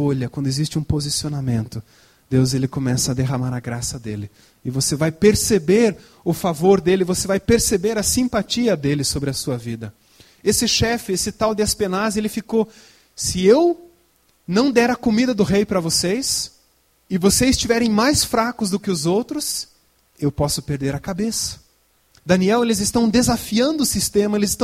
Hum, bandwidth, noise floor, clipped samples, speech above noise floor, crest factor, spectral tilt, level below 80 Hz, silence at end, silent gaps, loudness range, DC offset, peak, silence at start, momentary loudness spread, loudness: none; 16.5 kHz; -60 dBFS; under 0.1%; 41 dB; 18 dB; -4.5 dB/octave; -42 dBFS; 0 s; none; 4 LU; under 0.1%; -2 dBFS; 0 s; 10 LU; -19 LUFS